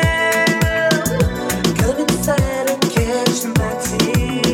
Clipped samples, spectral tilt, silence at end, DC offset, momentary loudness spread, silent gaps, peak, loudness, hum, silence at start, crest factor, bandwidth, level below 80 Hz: under 0.1%; -4.5 dB/octave; 0 s; under 0.1%; 4 LU; none; -2 dBFS; -17 LUFS; none; 0 s; 14 dB; 18.5 kHz; -30 dBFS